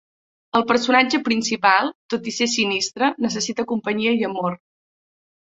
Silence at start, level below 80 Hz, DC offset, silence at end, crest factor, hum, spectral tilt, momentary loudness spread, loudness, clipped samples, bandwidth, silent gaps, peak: 0.55 s; -64 dBFS; under 0.1%; 0.85 s; 20 dB; none; -3 dB/octave; 9 LU; -20 LUFS; under 0.1%; 8.2 kHz; 1.95-2.09 s; -2 dBFS